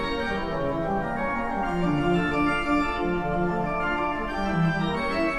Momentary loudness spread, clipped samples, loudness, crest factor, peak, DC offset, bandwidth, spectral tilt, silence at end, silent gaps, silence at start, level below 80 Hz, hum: 4 LU; under 0.1%; -26 LUFS; 14 dB; -12 dBFS; under 0.1%; 11.5 kHz; -7 dB/octave; 0 s; none; 0 s; -40 dBFS; none